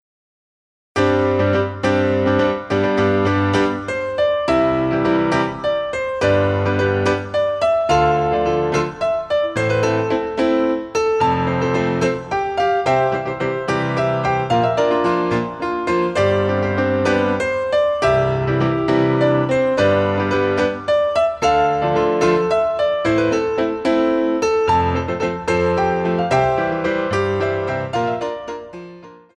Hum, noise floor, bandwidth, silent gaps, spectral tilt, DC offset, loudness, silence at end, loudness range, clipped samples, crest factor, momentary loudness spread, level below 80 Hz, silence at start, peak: none; -40 dBFS; 10.5 kHz; none; -6.5 dB/octave; under 0.1%; -18 LUFS; 0.2 s; 2 LU; under 0.1%; 14 dB; 5 LU; -44 dBFS; 0.95 s; -4 dBFS